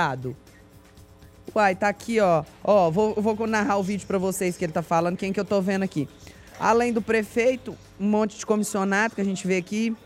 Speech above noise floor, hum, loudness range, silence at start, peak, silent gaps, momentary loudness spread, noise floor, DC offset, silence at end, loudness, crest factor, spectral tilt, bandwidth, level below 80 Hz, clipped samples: 26 dB; none; 2 LU; 0 s; -6 dBFS; none; 8 LU; -50 dBFS; under 0.1%; 0.1 s; -24 LUFS; 18 dB; -5.5 dB/octave; 15.5 kHz; -56 dBFS; under 0.1%